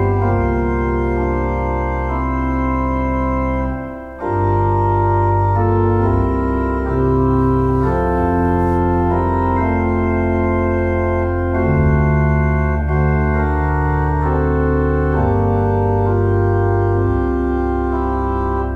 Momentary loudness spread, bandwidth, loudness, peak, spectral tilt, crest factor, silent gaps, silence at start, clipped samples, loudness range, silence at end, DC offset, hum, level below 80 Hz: 4 LU; 4.2 kHz; -17 LUFS; -4 dBFS; -10.5 dB/octave; 12 dB; none; 0 s; under 0.1%; 3 LU; 0 s; under 0.1%; none; -22 dBFS